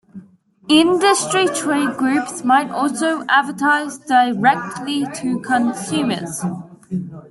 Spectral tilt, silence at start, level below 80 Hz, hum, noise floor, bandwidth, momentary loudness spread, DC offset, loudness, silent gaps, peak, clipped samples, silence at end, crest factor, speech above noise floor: -3.5 dB/octave; 0.15 s; -62 dBFS; none; -47 dBFS; 12.5 kHz; 11 LU; under 0.1%; -18 LUFS; none; -2 dBFS; under 0.1%; 0.05 s; 16 dB; 30 dB